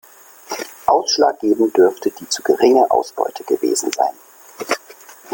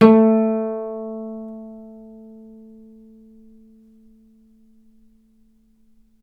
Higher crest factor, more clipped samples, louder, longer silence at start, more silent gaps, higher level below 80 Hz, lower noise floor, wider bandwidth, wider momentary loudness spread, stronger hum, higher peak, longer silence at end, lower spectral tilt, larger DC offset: second, 16 dB vs 22 dB; neither; about the same, -17 LUFS vs -19 LUFS; first, 0.5 s vs 0 s; neither; about the same, -60 dBFS vs -62 dBFS; second, -42 dBFS vs -56 dBFS; first, 17 kHz vs 4.9 kHz; second, 11 LU vs 29 LU; neither; about the same, -2 dBFS vs 0 dBFS; second, 0 s vs 4.25 s; second, -2.5 dB/octave vs -9.5 dB/octave; neither